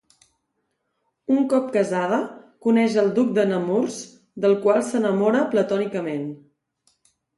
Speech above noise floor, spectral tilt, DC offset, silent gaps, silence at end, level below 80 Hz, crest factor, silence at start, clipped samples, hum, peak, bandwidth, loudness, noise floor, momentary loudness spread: 54 dB; -6 dB/octave; under 0.1%; none; 1 s; -72 dBFS; 18 dB; 1.3 s; under 0.1%; none; -4 dBFS; 11.5 kHz; -21 LUFS; -75 dBFS; 11 LU